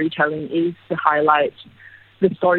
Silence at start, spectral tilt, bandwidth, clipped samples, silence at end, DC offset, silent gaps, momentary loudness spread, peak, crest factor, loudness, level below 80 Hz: 0 s; -9 dB/octave; 4.4 kHz; under 0.1%; 0 s; under 0.1%; none; 7 LU; 0 dBFS; 20 dB; -19 LUFS; -62 dBFS